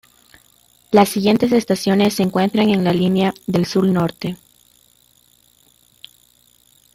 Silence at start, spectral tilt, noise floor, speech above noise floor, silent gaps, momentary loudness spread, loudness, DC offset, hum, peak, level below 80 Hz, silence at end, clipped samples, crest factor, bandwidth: 0.9 s; -6 dB/octave; -55 dBFS; 39 dB; none; 6 LU; -17 LUFS; under 0.1%; none; -2 dBFS; -56 dBFS; 2.6 s; under 0.1%; 18 dB; 16 kHz